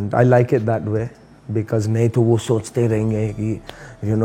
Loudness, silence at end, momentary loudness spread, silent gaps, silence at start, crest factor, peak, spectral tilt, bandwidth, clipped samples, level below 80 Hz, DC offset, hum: -19 LUFS; 0 s; 12 LU; none; 0 s; 18 dB; 0 dBFS; -8 dB/octave; 10.5 kHz; under 0.1%; -48 dBFS; under 0.1%; none